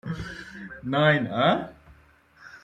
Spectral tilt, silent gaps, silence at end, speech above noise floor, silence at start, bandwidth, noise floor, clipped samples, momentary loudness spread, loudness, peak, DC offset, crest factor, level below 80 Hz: -7 dB/octave; none; 0.05 s; 33 dB; 0.05 s; 9.2 kHz; -57 dBFS; under 0.1%; 18 LU; -24 LUFS; -8 dBFS; under 0.1%; 20 dB; -54 dBFS